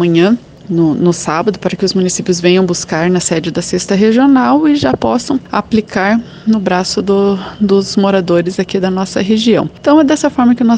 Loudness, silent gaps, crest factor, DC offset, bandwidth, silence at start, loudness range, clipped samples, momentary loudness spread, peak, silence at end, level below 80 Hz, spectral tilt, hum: -12 LUFS; none; 12 dB; under 0.1%; 10 kHz; 0 s; 2 LU; under 0.1%; 6 LU; 0 dBFS; 0 s; -44 dBFS; -5.5 dB/octave; none